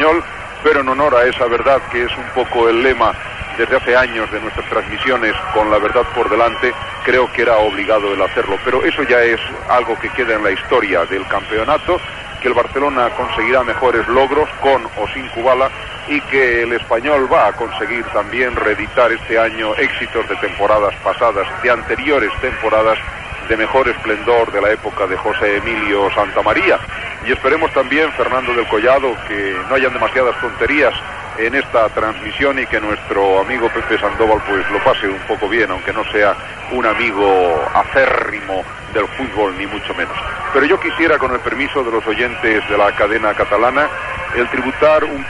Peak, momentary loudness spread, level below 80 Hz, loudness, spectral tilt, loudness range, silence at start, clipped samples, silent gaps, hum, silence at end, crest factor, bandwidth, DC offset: 0 dBFS; 7 LU; -38 dBFS; -15 LUFS; -5 dB/octave; 2 LU; 0 s; under 0.1%; none; none; 0 s; 16 dB; 11.5 kHz; 0.3%